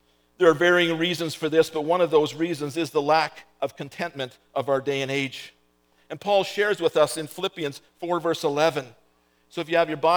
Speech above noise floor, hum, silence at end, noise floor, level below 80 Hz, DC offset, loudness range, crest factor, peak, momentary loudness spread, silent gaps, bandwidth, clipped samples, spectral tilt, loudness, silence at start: 40 dB; none; 0 s; -64 dBFS; -74 dBFS; under 0.1%; 5 LU; 18 dB; -6 dBFS; 12 LU; none; over 20 kHz; under 0.1%; -4.5 dB/octave; -24 LUFS; 0.4 s